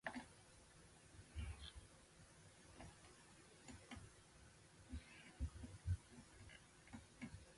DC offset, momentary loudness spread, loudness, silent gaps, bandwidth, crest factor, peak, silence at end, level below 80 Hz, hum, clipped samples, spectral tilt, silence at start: under 0.1%; 14 LU; -57 LUFS; none; 11.5 kHz; 24 dB; -32 dBFS; 0 s; -60 dBFS; none; under 0.1%; -5 dB/octave; 0.05 s